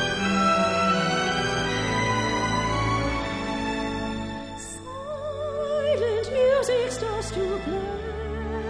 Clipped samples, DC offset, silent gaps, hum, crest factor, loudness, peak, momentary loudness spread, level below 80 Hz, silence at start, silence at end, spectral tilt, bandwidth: under 0.1%; under 0.1%; none; none; 14 dB; -25 LUFS; -10 dBFS; 11 LU; -40 dBFS; 0 s; 0 s; -4.5 dB/octave; 11 kHz